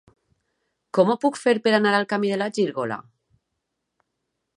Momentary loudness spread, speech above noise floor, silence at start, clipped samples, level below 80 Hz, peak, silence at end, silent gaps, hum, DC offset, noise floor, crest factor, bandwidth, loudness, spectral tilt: 10 LU; 58 dB; 0.95 s; under 0.1%; -74 dBFS; -6 dBFS; 1.55 s; none; none; under 0.1%; -79 dBFS; 20 dB; 11.5 kHz; -22 LUFS; -5.5 dB/octave